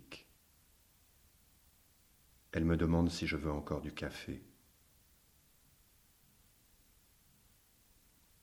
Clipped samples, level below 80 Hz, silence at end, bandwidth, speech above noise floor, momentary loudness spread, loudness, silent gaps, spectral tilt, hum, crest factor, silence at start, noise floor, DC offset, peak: under 0.1%; -56 dBFS; 4 s; over 20 kHz; 33 dB; 17 LU; -37 LUFS; none; -6.5 dB/octave; none; 22 dB; 0.1 s; -68 dBFS; under 0.1%; -18 dBFS